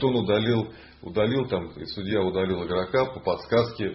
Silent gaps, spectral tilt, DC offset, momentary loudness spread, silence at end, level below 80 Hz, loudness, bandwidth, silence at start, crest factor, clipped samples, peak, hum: none; -10 dB/octave; under 0.1%; 10 LU; 0 s; -50 dBFS; -26 LUFS; 5.8 kHz; 0 s; 16 dB; under 0.1%; -10 dBFS; none